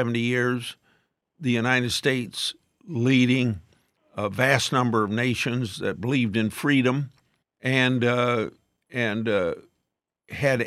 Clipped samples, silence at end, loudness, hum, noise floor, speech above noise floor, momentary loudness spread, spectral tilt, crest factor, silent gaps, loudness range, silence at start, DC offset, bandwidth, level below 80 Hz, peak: under 0.1%; 0 s; -24 LUFS; none; -81 dBFS; 58 dB; 11 LU; -5.5 dB/octave; 20 dB; none; 2 LU; 0 s; under 0.1%; 14.5 kHz; -66 dBFS; -4 dBFS